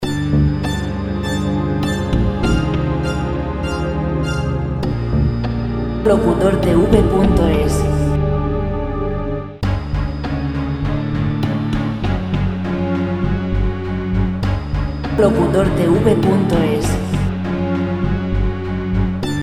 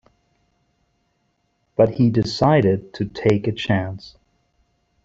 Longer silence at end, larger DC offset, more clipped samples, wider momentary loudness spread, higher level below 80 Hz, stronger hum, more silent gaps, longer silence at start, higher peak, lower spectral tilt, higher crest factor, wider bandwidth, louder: second, 0 s vs 0.95 s; neither; neither; second, 8 LU vs 12 LU; first, -24 dBFS vs -52 dBFS; neither; neither; second, 0 s vs 1.8 s; about the same, 0 dBFS vs -2 dBFS; about the same, -7.5 dB/octave vs -7.5 dB/octave; about the same, 16 dB vs 20 dB; first, 14 kHz vs 7.8 kHz; about the same, -18 LUFS vs -20 LUFS